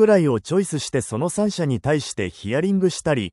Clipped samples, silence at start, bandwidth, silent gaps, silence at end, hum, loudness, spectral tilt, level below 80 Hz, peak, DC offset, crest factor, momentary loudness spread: under 0.1%; 0 s; 12 kHz; none; 0.05 s; none; -22 LUFS; -5.5 dB/octave; -52 dBFS; -6 dBFS; under 0.1%; 16 dB; 6 LU